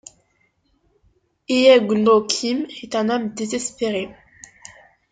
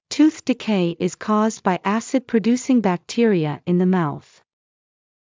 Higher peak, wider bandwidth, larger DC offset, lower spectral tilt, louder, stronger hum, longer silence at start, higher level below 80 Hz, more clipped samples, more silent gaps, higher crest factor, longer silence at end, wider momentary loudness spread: about the same, -2 dBFS vs -4 dBFS; first, 9.4 kHz vs 7.8 kHz; neither; second, -3.5 dB/octave vs -6 dB/octave; about the same, -19 LUFS vs -20 LUFS; neither; first, 1.5 s vs 0.1 s; about the same, -62 dBFS vs -66 dBFS; neither; neither; about the same, 20 dB vs 16 dB; about the same, 1 s vs 1.1 s; first, 14 LU vs 5 LU